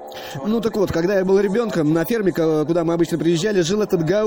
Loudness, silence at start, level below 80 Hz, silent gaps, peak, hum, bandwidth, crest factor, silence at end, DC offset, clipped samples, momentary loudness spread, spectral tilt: -19 LUFS; 0 s; -48 dBFS; none; -6 dBFS; none; 17 kHz; 12 dB; 0 s; under 0.1%; under 0.1%; 4 LU; -6 dB/octave